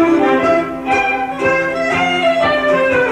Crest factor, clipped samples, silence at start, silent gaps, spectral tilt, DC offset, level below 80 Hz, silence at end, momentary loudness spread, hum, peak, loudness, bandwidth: 12 dB; under 0.1%; 0 s; none; -5 dB/octave; under 0.1%; -46 dBFS; 0 s; 4 LU; none; -2 dBFS; -14 LUFS; 12.5 kHz